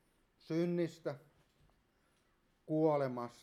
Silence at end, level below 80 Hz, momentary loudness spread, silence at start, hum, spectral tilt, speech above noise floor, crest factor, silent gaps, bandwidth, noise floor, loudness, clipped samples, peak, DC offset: 0.1 s; -80 dBFS; 12 LU; 0.5 s; none; -8 dB/octave; 39 dB; 18 dB; none; 13 kHz; -75 dBFS; -37 LUFS; under 0.1%; -20 dBFS; under 0.1%